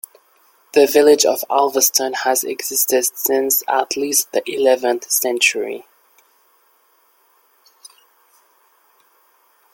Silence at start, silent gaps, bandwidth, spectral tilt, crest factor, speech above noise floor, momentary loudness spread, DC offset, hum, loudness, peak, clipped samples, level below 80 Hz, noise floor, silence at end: 0.75 s; none; 17 kHz; -0.5 dB/octave; 20 dB; 41 dB; 8 LU; under 0.1%; none; -16 LUFS; 0 dBFS; under 0.1%; -68 dBFS; -58 dBFS; 3.9 s